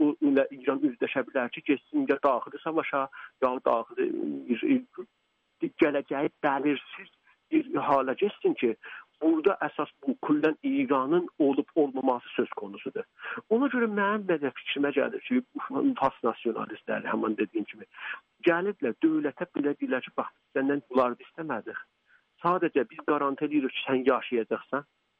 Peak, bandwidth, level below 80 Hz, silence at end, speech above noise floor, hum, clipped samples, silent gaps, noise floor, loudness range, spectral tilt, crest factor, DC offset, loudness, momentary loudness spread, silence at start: -12 dBFS; 4.9 kHz; -74 dBFS; 0.4 s; 40 dB; none; under 0.1%; none; -69 dBFS; 3 LU; -4 dB/octave; 18 dB; under 0.1%; -29 LUFS; 10 LU; 0 s